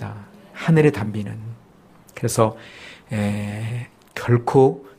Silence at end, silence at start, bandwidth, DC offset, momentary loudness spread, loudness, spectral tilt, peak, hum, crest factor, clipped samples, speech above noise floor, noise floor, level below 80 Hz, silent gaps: 0.1 s; 0 s; 15.5 kHz; under 0.1%; 23 LU; -21 LUFS; -7 dB/octave; -2 dBFS; none; 20 dB; under 0.1%; 30 dB; -50 dBFS; -54 dBFS; none